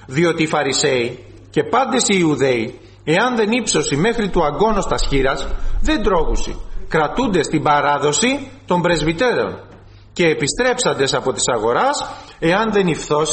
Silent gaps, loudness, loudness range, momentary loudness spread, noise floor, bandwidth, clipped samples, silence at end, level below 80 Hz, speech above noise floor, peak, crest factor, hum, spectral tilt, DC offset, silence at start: none; -17 LUFS; 2 LU; 9 LU; -41 dBFS; 8.8 kHz; under 0.1%; 0 s; -28 dBFS; 24 dB; -4 dBFS; 14 dB; none; -4 dB/octave; under 0.1%; 0 s